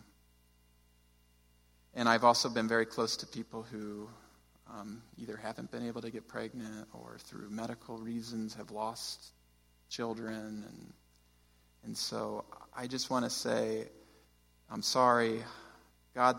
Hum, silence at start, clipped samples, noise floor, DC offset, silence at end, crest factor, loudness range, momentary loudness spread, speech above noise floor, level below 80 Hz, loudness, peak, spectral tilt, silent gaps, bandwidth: 60 Hz at -65 dBFS; 1.95 s; under 0.1%; -67 dBFS; under 0.1%; 0 s; 26 dB; 11 LU; 21 LU; 32 dB; -70 dBFS; -35 LUFS; -12 dBFS; -3.5 dB/octave; none; 16.5 kHz